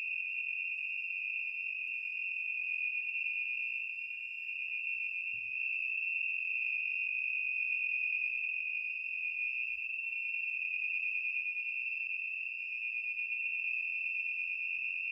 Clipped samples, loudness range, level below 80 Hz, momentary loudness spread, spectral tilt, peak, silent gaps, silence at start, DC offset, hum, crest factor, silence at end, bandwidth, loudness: under 0.1%; 2 LU; -82 dBFS; 4 LU; 0.5 dB/octave; -24 dBFS; none; 0 s; under 0.1%; none; 14 dB; 0 s; 7.8 kHz; -34 LUFS